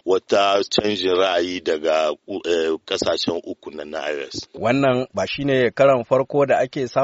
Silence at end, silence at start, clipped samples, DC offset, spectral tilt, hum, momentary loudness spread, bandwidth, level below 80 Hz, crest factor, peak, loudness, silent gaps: 0 s; 0.05 s; under 0.1%; under 0.1%; -3 dB/octave; none; 11 LU; 8 kHz; -56 dBFS; 18 dB; -2 dBFS; -20 LUFS; none